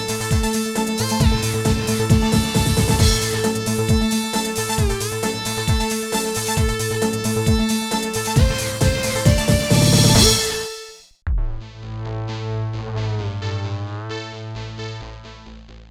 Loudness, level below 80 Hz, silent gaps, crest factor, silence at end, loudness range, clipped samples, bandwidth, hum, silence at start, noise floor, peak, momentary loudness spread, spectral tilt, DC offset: -19 LUFS; -28 dBFS; none; 20 dB; 0.05 s; 10 LU; under 0.1%; 17.5 kHz; none; 0 s; -40 dBFS; 0 dBFS; 15 LU; -4.5 dB/octave; under 0.1%